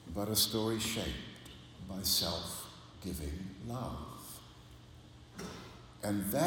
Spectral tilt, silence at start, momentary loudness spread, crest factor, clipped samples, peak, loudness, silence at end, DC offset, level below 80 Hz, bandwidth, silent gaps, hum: -3.5 dB/octave; 0 s; 22 LU; 22 dB; under 0.1%; -16 dBFS; -36 LUFS; 0 s; under 0.1%; -54 dBFS; 17.5 kHz; none; none